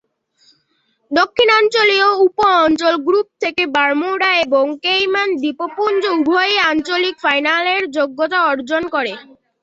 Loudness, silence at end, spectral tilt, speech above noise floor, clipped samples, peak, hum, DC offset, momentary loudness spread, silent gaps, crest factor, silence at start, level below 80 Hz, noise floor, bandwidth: -15 LUFS; 0.4 s; -3 dB/octave; 48 dB; under 0.1%; -2 dBFS; none; under 0.1%; 8 LU; none; 14 dB; 1.1 s; -58 dBFS; -64 dBFS; 8 kHz